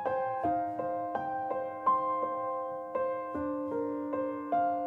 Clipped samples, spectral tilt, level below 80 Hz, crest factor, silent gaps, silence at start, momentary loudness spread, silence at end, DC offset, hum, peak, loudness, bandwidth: under 0.1%; -8.5 dB/octave; -66 dBFS; 16 dB; none; 0 s; 5 LU; 0 s; under 0.1%; none; -18 dBFS; -33 LUFS; 4.5 kHz